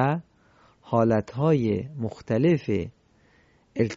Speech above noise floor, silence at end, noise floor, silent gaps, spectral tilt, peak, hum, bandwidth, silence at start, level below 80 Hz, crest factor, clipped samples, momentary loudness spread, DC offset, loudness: 37 dB; 0 s; -61 dBFS; none; -8.5 dB/octave; -8 dBFS; none; 7.6 kHz; 0 s; -52 dBFS; 18 dB; under 0.1%; 11 LU; under 0.1%; -25 LUFS